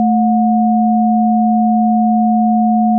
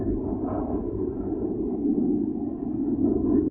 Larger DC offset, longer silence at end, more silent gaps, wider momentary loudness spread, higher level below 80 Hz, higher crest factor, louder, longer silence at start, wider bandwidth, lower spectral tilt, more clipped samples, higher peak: neither; about the same, 0 s vs 0 s; neither; second, 0 LU vs 6 LU; second, -86 dBFS vs -42 dBFS; second, 6 dB vs 14 dB; first, -13 LUFS vs -27 LUFS; about the same, 0 s vs 0 s; second, 0.8 kHz vs 2 kHz; second, -0.5 dB/octave vs -13.5 dB/octave; neither; first, -6 dBFS vs -12 dBFS